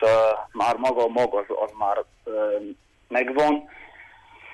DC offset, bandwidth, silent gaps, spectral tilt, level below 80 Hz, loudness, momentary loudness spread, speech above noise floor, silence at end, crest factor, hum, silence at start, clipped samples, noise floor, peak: under 0.1%; 11.5 kHz; none; -5 dB/octave; -60 dBFS; -24 LUFS; 10 LU; 25 dB; 0 s; 14 dB; none; 0 s; under 0.1%; -49 dBFS; -10 dBFS